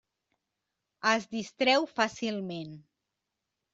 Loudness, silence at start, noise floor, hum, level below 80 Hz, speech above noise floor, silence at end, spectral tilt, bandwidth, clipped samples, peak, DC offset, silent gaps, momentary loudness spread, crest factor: -29 LUFS; 1.05 s; -86 dBFS; none; -74 dBFS; 56 dB; 0.95 s; -3.5 dB/octave; 8 kHz; under 0.1%; -10 dBFS; under 0.1%; none; 13 LU; 22 dB